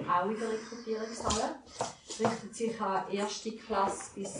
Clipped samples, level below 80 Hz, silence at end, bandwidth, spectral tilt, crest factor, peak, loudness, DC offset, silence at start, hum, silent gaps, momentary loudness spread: under 0.1%; -58 dBFS; 0 s; 10 kHz; -3.5 dB/octave; 20 dB; -14 dBFS; -34 LUFS; under 0.1%; 0 s; none; none; 7 LU